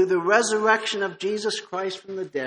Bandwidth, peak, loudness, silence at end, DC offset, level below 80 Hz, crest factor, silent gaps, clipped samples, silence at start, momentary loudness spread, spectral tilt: 10.5 kHz; -4 dBFS; -23 LUFS; 0 s; under 0.1%; -74 dBFS; 18 dB; none; under 0.1%; 0 s; 11 LU; -3 dB/octave